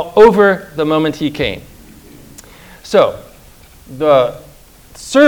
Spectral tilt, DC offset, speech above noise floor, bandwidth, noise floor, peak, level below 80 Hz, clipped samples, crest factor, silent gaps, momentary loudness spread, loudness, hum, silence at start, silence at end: -5.5 dB/octave; under 0.1%; 29 dB; over 20 kHz; -41 dBFS; 0 dBFS; -42 dBFS; 0.9%; 14 dB; none; 25 LU; -13 LUFS; none; 0 s; 0 s